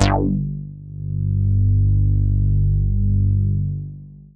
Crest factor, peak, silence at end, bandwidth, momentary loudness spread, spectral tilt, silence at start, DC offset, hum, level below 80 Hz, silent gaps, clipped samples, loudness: 18 dB; 0 dBFS; 0.2 s; 2.9 kHz; 14 LU; -8.5 dB/octave; 0 s; under 0.1%; 50 Hz at -25 dBFS; -24 dBFS; none; under 0.1%; -20 LUFS